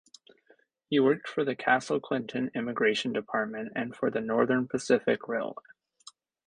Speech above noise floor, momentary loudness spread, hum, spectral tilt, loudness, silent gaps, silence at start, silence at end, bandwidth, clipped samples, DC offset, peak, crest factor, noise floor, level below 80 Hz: 37 dB; 8 LU; none; -5 dB/octave; -29 LUFS; none; 0.9 s; 0.95 s; 10.5 kHz; under 0.1%; under 0.1%; -10 dBFS; 20 dB; -65 dBFS; -72 dBFS